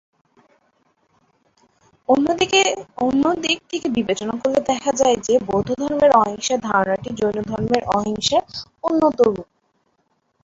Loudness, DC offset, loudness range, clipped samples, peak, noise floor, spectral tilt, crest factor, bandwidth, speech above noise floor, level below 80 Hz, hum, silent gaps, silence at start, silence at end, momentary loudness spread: -19 LUFS; under 0.1%; 2 LU; under 0.1%; -2 dBFS; -67 dBFS; -4 dB/octave; 18 dB; 8 kHz; 48 dB; -52 dBFS; none; none; 2.1 s; 1 s; 7 LU